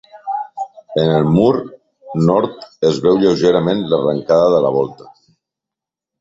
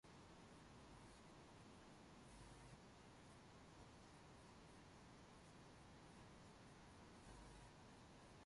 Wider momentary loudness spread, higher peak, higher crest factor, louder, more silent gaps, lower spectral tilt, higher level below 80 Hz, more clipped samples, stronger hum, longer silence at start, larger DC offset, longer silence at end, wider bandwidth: first, 12 LU vs 2 LU; first, 0 dBFS vs -48 dBFS; about the same, 16 dB vs 16 dB; first, -15 LUFS vs -65 LUFS; neither; first, -7.5 dB/octave vs -4.5 dB/octave; first, -50 dBFS vs -74 dBFS; neither; neither; about the same, 0.15 s vs 0.05 s; neither; first, 1.25 s vs 0 s; second, 7.8 kHz vs 11.5 kHz